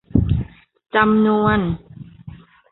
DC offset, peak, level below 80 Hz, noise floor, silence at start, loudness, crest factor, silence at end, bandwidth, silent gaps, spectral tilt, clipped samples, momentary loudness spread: under 0.1%; -2 dBFS; -34 dBFS; -40 dBFS; 0.15 s; -18 LUFS; 18 dB; 0.35 s; 4.1 kHz; none; -12 dB/octave; under 0.1%; 21 LU